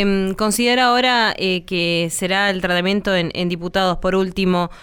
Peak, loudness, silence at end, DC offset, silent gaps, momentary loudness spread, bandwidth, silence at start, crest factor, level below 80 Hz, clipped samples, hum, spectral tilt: -4 dBFS; -18 LUFS; 0 s; under 0.1%; none; 5 LU; 19 kHz; 0 s; 14 dB; -40 dBFS; under 0.1%; none; -4 dB/octave